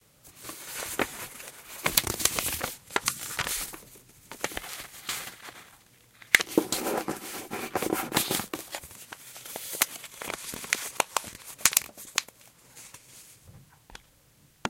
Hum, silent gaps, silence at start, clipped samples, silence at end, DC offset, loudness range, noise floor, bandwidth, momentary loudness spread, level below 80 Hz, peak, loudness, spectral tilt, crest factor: none; none; 0.25 s; under 0.1%; 0 s; under 0.1%; 4 LU; -61 dBFS; 17 kHz; 23 LU; -58 dBFS; 0 dBFS; -29 LUFS; -1.5 dB/octave; 32 dB